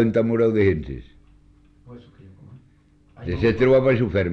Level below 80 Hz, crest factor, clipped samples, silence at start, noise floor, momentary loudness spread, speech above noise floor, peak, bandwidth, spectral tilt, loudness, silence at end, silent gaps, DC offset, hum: -42 dBFS; 14 dB; under 0.1%; 0 s; -56 dBFS; 19 LU; 37 dB; -8 dBFS; 6.6 kHz; -9 dB/octave; -20 LUFS; 0 s; none; under 0.1%; none